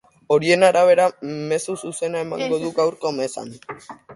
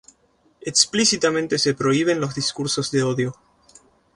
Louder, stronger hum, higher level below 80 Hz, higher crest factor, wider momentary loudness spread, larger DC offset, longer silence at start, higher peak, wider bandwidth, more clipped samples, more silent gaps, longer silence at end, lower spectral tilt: about the same, -20 LUFS vs -20 LUFS; neither; second, -66 dBFS vs -60 dBFS; about the same, 18 dB vs 20 dB; first, 19 LU vs 7 LU; neither; second, 0.3 s vs 0.65 s; about the same, -2 dBFS vs -2 dBFS; about the same, 11.5 kHz vs 11.5 kHz; neither; neither; second, 0 s vs 0.85 s; first, -4.5 dB/octave vs -3 dB/octave